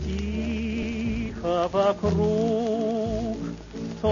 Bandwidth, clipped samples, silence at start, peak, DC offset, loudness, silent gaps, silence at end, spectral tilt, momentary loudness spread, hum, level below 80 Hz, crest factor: 7.4 kHz; under 0.1%; 0 s; -12 dBFS; under 0.1%; -26 LUFS; none; 0 s; -7 dB/octave; 9 LU; none; -38 dBFS; 14 dB